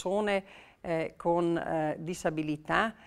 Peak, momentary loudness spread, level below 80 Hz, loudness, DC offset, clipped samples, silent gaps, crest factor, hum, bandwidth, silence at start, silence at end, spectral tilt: -10 dBFS; 5 LU; -60 dBFS; -31 LUFS; under 0.1%; under 0.1%; none; 20 dB; none; 13.5 kHz; 0 s; 0 s; -6 dB/octave